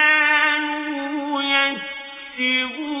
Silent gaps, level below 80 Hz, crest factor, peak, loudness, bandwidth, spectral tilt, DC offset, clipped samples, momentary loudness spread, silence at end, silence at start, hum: none; -64 dBFS; 16 dB; -4 dBFS; -19 LUFS; 3.9 kHz; -4.5 dB/octave; under 0.1%; under 0.1%; 15 LU; 0 s; 0 s; none